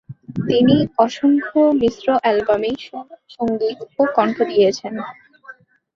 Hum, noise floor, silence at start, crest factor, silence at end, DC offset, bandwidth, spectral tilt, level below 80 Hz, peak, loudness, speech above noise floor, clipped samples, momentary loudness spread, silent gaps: none; -44 dBFS; 0.1 s; 16 dB; 0.45 s; under 0.1%; 7.4 kHz; -6.5 dB/octave; -54 dBFS; -2 dBFS; -18 LUFS; 26 dB; under 0.1%; 14 LU; none